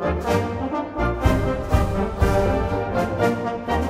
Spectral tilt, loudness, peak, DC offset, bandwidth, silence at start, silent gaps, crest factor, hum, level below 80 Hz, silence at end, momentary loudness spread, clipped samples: -7 dB/octave; -22 LUFS; -4 dBFS; under 0.1%; 16 kHz; 0 s; none; 16 dB; none; -28 dBFS; 0 s; 5 LU; under 0.1%